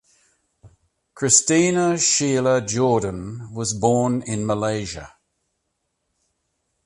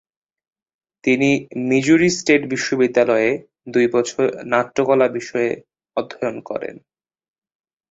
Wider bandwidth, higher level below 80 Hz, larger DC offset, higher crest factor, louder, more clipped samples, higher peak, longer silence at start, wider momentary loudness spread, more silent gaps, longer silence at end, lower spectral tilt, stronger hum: first, 11.5 kHz vs 8 kHz; first, -52 dBFS vs -60 dBFS; neither; about the same, 22 dB vs 18 dB; about the same, -19 LUFS vs -19 LUFS; neither; about the same, 0 dBFS vs -2 dBFS; second, 0.65 s vs 1.05 s; about the same, 13 LU vs 13 LU; neither; first, 1.75 s vs 1.1 s; about the same, -4 dB/octave vs -5 dB/octave; neither